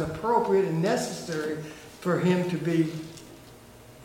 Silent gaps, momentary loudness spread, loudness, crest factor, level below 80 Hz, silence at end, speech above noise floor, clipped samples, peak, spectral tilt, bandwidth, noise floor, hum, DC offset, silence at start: none; 18 LU; -27 LUFS; 18 dB; -58 dBFS; 0 s; 23 dB; under 0.1%; -10 dBFS; -6 dB/octave; 16.5 kHz; -49 dBFS; none; under 0.1%; 0 s